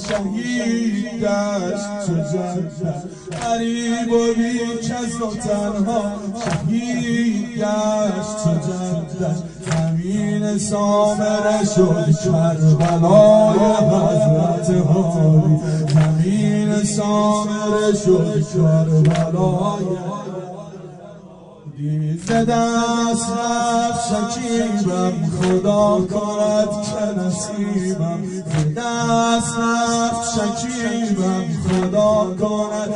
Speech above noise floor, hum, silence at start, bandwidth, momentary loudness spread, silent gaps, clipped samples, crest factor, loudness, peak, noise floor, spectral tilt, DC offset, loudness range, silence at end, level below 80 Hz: 23 dB; none; 0 s; 10.5 kHz; 8 LU; none; under 0.1%; 16 dB; -18 LUFS; 0 dBFS; -40 dBFS; -6 dB/octave; under 0.1%; 7 LU; 0 s; -48 dBFS